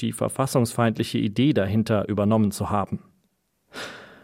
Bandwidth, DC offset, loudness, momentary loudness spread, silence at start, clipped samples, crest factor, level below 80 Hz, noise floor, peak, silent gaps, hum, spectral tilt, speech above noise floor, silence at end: 16.5 kHz; under 0.1%; -23 LUFS; 15 LU; 0 s; under 0.1%; 18 dB; -56 dBFS; -70 dBFS; -6 dBFS; none; none; -6 dB/octave; 47 dB; 0.2 s